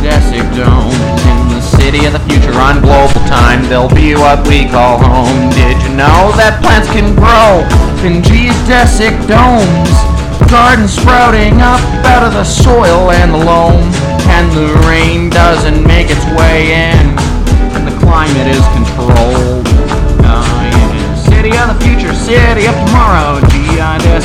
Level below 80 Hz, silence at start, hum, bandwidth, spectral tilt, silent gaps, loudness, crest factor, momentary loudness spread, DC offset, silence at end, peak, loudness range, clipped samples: -10 dBFS; 0 s; none; 14.5 kHz; -6 dB/octave; none; -7 LUFS; 6 dB; 4 LU; under 0.1%; 0 s; 0 dBFS; 2 LU; 1%